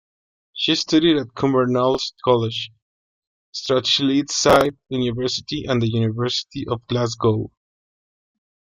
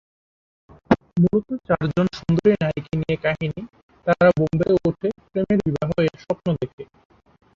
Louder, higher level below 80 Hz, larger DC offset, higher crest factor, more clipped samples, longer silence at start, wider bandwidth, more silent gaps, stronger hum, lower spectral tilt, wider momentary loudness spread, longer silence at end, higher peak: about the same, -20 LUFS vs -22 LUFS; about the same, -52 dBFS vs -48 dBFS; neither; about the same, 20 dB vs 20 dB; neither; second, 0.55 s vs 0.9 s; first, 16 kHz vs 7.2 kHz; first, 2.82-3.53 s vs 3.83-3.89 s, 6.73-6.78 s; neither; second, -5 dB/octave vs -8.5 dB/octave; about the same, 11 LU vs 10 LU; first, 1.25 s vs 0.7 s; about the same, -2 dBFS vs -2 dBFS